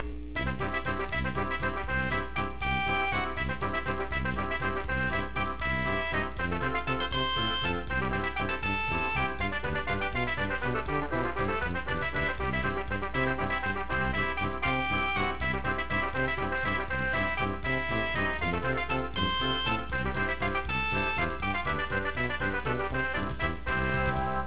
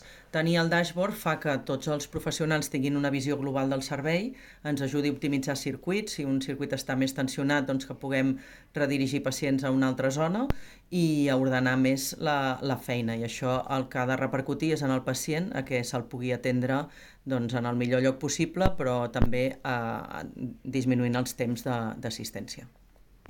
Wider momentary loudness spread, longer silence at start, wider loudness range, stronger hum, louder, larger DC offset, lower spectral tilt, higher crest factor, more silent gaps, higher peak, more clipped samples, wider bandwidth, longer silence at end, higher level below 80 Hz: second, 4 LU vs 8 LU; about the same, 0 s vs 0 s; about the same, 1 LU vs 3 LU; neither; about the same, -30 LUFS vs -29 LUFS; first, 1% vs under 0.1%; second, -3 dB/octave vs -5.5 dB/octave; second, 16 dB vs 22 dB; neither; second, -14 dBFS vs -6 dBFS; neither; second, 4 kHz vs 17 kHz; second, 0 s vs 0.6 s; first, -42 dBFS vs -48 dBFS